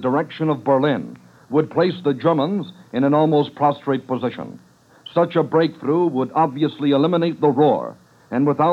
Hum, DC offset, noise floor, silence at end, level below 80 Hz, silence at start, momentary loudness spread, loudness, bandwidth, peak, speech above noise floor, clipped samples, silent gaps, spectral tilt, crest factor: none; under 0.1%; -44 dBFS; 0 s; -72 dBFS; 0 s; 9 LU; -19 LUFS; 7.2 kHz; -4 dBFS; 26 dB; under 0.1%; none; -8.5 dB/octave; 14 dB